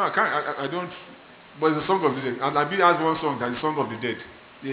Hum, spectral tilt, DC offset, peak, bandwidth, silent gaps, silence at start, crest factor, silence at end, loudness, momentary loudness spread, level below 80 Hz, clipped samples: none; -9 dB/octave; under 0.1%; -4 dBFS; 4 kHz; none; 0 s; 20 dB; 0 s; -24 LUFS; 16 LU; -62 dBFS; under 0.1%